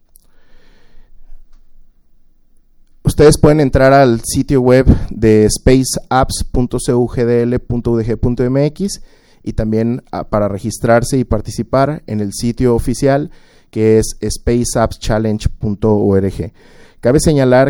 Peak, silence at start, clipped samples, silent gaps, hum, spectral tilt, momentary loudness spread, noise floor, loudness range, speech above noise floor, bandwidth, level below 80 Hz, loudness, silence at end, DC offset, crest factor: 0 dBFS; 0.95 s; under 0.1%; none; none; -6 dB/octave; 10 LU; -47 dBFS; 6 LU; 34 dB; 17.5 kHz; -26 dBFS; -14 LUFS; 0 s; under 0.1%; 14 dB